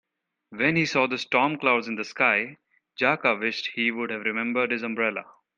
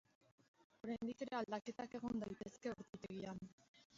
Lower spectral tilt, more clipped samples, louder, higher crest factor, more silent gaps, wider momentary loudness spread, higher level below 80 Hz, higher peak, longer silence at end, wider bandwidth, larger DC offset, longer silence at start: about the same, -5 dB/octave vs -5 dB/octave; neither; first, -24 LUFS vs -48 LUFS; about the same, 20 dB vs 20 dB; second, none vs 3.53-3.58 s, 3.68-3.74 s, 3.85-3.90 s; about the same, 6 LU vs 8 LU; first, -70 dBFS vs -76 dBFS; first, -6 dBFS vs -30 dBFS; first, 0.35 s vs 0 s; first, 9.2 kHz vs 7.6 kHz; neither; second, 0.5 s vs 0.85 s